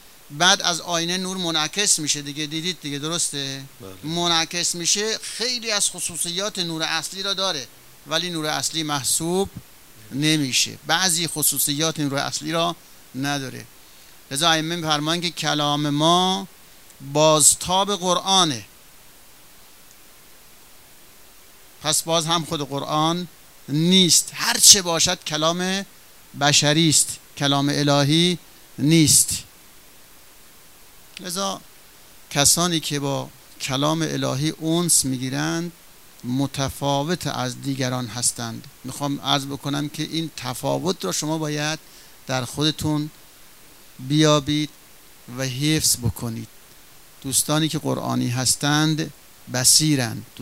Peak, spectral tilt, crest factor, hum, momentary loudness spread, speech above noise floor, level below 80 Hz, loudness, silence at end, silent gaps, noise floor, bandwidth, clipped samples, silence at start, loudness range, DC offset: 0 dBFS; -3 dB/octave; 22 dB; none; 14 LU; 27 dB; -54 dBFS; -20 LUFS; 0 s; none; -49 dBFS; 16 kHz; under 0.1%; 0.3 s; 8 LU; 0.3%